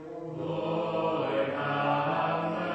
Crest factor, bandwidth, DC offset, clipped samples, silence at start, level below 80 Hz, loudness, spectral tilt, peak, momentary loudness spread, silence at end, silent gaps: 14 dB; 8.4 kHz; under 0.1%; under 0.1%; 0 s; -68 dBFS; -30 LUFS; -7.5 dB/octave; -16 dBFS; 6 LU; 0 s; none